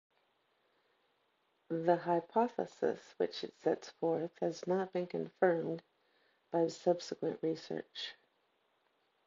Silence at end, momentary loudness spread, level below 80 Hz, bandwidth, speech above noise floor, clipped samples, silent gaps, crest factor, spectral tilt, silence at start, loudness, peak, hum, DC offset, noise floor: 1.15 s; 9 LU; -88 dBFS; 7.4 kHz; 42 dB; under 0.1%; none; 22 dB; -4.5 dB/octave; 1.7 s; -36 LUFS; -16 dBFS; none; under 0.1%; -77 dBFS